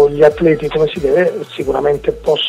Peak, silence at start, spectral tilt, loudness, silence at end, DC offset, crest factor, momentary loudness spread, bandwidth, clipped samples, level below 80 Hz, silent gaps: 0 dBFS; 0 s; -6 dB/octave; -14 LUFS; 0 s; under 0.1%; 14 dB; 7 LU; 11.5 kHz; under 0.1%; -38 dBFS; none